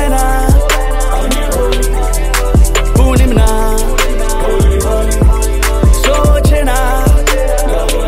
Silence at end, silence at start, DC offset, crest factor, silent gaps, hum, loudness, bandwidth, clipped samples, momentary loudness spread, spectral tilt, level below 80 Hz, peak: 0 s; 0 s; under 0.1%; 10 dB; none; none; -12 LUFS; 16 kHz; under 0.1%; 5 LU; -5 dB/octave; -10 dBFS; 0 dBFS